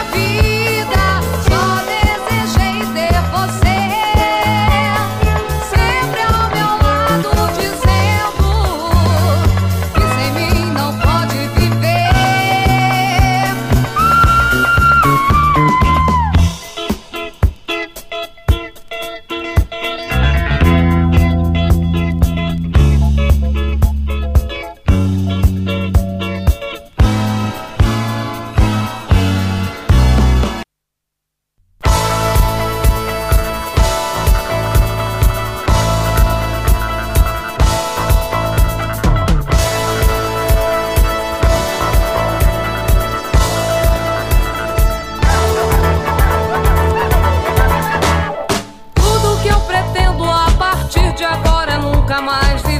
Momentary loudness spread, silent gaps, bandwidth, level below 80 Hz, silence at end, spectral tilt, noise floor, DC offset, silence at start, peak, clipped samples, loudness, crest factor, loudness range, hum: 6 LU; none; 15.5 kHz; -18 dBFS; 0 s; -5.5 dB/octave; -77 dBFS; under 0.1%; 0 s; 0 dBFS; under 0.1%; -14 LUFS; 14 dB; 4 LU; none